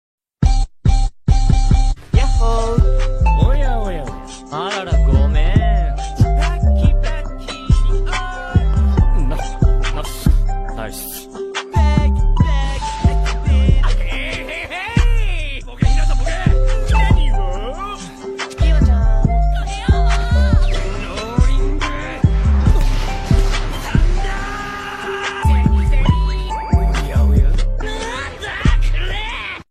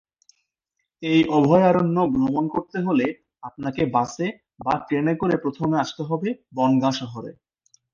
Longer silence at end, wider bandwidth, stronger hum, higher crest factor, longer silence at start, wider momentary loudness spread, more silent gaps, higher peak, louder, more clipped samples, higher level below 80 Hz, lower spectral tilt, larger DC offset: second, 0.1 s vs 0.6 s; first, 13.5 kHz vs 7.4 kHz; neither; second, 12 dB vs 18 dB; second, 0.4 s vs 1 s; second, 10 LU vs 14 LU; neither; about the same, -2 dBFS vs -4 dBFS; first, -18 LUFS vs -22 LUFS; neither; first, -16 dBFS vs -58 dBFS; about the same, -6 dB/octave vs -7 dB/octave; neither